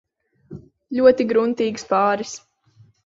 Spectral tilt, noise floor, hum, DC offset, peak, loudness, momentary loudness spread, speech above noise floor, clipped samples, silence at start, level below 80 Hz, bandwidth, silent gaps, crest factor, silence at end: -5 dB/octave; -55 dBFS; none; under 0.1%; -2 dBFS; -19 LUFS; 14 LU; 36 dB; under 0.1%; 0.5 s; -60 dBFS; 7.8 kHz; none; 18 dB; 0.7 s